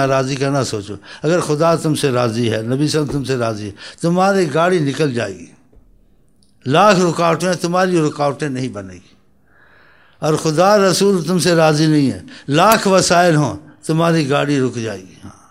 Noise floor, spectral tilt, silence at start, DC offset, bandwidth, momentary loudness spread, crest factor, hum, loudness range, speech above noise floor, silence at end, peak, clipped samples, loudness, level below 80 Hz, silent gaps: -55 dBFS; -5 dB/octave; 0 s; 0.2%; 16 kHz; 14 LU; 16 dB; none; 5 LU; 40 dB; 0.2 s; 0 dBFS; under 0.1%; -15 LUFS; -52 dBFS; none